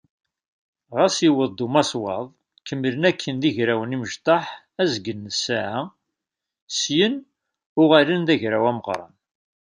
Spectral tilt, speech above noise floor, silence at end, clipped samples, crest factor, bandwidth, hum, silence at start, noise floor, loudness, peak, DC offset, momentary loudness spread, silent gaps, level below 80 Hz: -4.5 dB/octave; 64 dB; 0.55 s; under 0.1%; 20 dB; 10 kHz; none; 0.9 s; -85 dBFS; -21 LUFS; -2 dBFS; under 0.1%; 13 LU; 6.62-6.67 s, 7.66-7.76 s; -64 dBFS